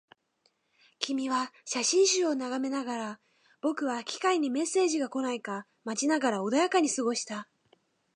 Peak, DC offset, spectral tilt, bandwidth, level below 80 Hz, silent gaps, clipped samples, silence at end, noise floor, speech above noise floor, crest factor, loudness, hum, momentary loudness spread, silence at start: -10 dBFS; under 0.1%; -2.5 dB/octave; 11 kHz; -86 dBFS; none; under 0.1%; 0.7 s; -73 dBFS; 44 dB; 20 dB; -29 LUFS; none; 11 LU; 1 s